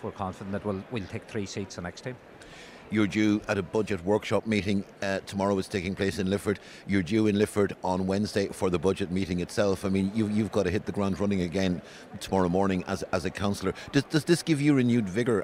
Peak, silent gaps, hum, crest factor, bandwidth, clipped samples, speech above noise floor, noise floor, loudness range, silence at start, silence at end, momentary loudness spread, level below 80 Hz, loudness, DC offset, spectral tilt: -12 dBFS; none; none; 16 dB; 15.5 kHz; under 0.1%; 20 dB; -47 dBFS; 3 LU; 0 s; 0 s; 11 LU; -58 dBFS; -28 LUFS; under 0.1%; -6 dB/octave